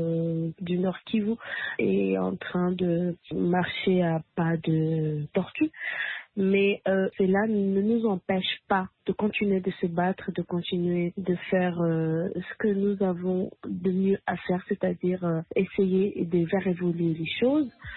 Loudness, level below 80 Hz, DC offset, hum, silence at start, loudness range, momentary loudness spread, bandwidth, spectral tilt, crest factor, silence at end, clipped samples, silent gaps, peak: -27 LUFS; -62 dBFS; under 0.1%; none; 0 s; 2 LU; 6 LU; 4.2 kHz; -11.5 dB/octave; 14 dB; 0 s; under 0.1%; none; -12 dBFS